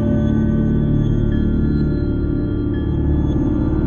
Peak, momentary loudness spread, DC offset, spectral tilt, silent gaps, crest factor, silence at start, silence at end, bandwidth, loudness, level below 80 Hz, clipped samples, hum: -6 dBFS; 3 LU; under 0.1%; -10.5 dB/octave; none; 12 dB; 0 s; 0 s; 6.8 kHz; -18 LUFS; -22 dBFS; under 0.1%; none